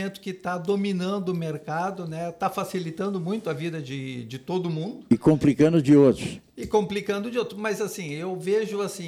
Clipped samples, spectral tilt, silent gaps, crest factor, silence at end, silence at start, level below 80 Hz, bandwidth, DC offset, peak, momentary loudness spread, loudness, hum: under 0.1%; -6.5 dB/octave; none; 18 dB; 0 s; 0 s; -56 dBFS; 15 kHz; under 0.1%; -8 dBFS; 13 LU; -25 LUFS; none